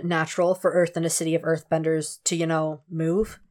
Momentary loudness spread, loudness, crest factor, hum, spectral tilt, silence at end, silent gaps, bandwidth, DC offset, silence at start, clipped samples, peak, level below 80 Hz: 4 LU; -24 LUFS; 14 dB; none; -4.5 dB/octave; 0.15 s; none; 17.5 kHz; under 0.1%; 0 s; under 0.1%; -10 dBFS; -54 dBFS